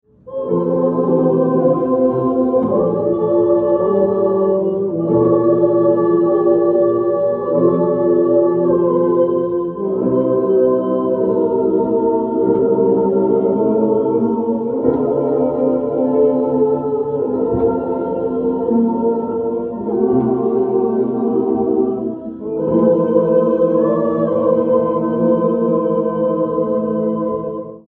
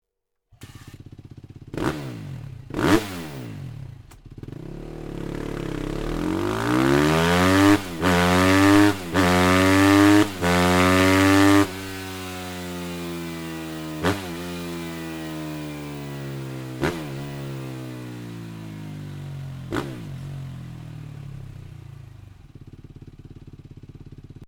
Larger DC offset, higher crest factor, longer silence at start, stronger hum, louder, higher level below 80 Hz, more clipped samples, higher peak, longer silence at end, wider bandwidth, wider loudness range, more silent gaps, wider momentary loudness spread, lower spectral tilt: neither; second, 14 dB vs 22 dB; second, 0.25 s vs 0.6 s; neither; first, -16 LUFS vs -21 LUFS; about the same, -50 dBFS vs -46 dBFS; neither; about the same, -2 dBFS vs -2 dBFS; about the same, 0.1 s vs 0 s; second, 3.3 kHz vs over 20 kHz; second, 3 LU vs 18 LU; neither; second, 5 LU vs 21 LU; first, -12.5 dB/octave vs -5.5 dB/octave